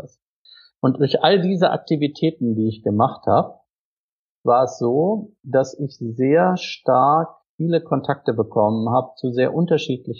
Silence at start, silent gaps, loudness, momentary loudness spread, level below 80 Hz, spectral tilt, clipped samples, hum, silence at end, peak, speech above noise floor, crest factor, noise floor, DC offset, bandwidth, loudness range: 0.05 s; 0.22-0.45 s, 3.70-4.44 s, 7.49-7.59 s; -20 LUFS; 8 LU; -68 dBFS; -7 dB/octave; under 0.1%; none; 0 s; -2 dBFS; over 71 dB; 18 dB; under -90 dBFS; under 0.1%; 7.4 kHz; 2 LU